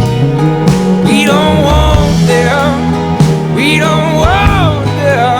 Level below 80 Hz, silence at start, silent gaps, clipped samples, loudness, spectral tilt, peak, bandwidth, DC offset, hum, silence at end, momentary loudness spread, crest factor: -20 dBFS; 0 s; none; 0.2%; -9 LUFS; -6 dB/octave; 0 dBFS; 17.5 kHz; under 0.1%; none; 0 s; 3 LU; 8 dB